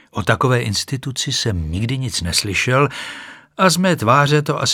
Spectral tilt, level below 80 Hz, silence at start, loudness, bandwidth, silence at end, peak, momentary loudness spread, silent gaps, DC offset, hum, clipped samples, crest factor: -4 dB/octave; -40 dBFS; 0.15 s; -17 LUFS; 17.5 kHz; 0 s; 0 dBFS; 9 LU; none; under 0.1%; none; under 0.1%; 18 dB